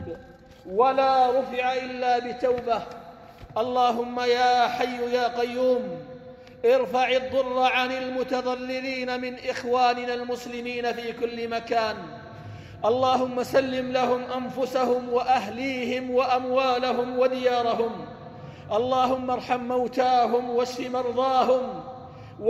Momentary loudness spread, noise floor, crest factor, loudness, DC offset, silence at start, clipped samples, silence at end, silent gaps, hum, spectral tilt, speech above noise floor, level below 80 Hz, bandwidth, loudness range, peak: 14 LU; -47 dBFS; 16 dB; -25 LUFS; under 0.1%; 0 s; under 0.1%; 0 s; none; none; -4.5 dB/octave; 23 dB; -60 dBFS; 13 kHz; 3 LU; -8 dBFS